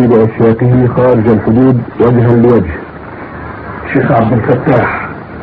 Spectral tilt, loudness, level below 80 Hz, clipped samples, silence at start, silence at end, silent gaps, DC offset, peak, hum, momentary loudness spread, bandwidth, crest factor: -11.5 dB/octave; -9 LUFS; -34 dBFS; 0.4%; 0 s; 0 s; none; under 0.1%; 0 dBFS; none; 16 LU; 4.6 kHz; 10 dB